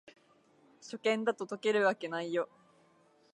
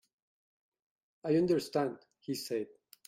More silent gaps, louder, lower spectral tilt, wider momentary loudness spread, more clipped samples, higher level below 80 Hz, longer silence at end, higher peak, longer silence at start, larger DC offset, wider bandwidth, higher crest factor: neither; about the same, -33 LUFS vs -34 LUFS; second, -4.5 dB/octave vs -6 dB/octave; about the same, 14 LU vs 15 LU; neither; second, -90 dBFS vs -76 dBFS; first, 0.9 s vs 0.4 s; about the same, -16 dBFS vs -18 dBFS; second, 0.05 s vs 1.25 s; neither; second, 11 kHz vs 16.5 kHz; about the same, 18 dB vs 18 dB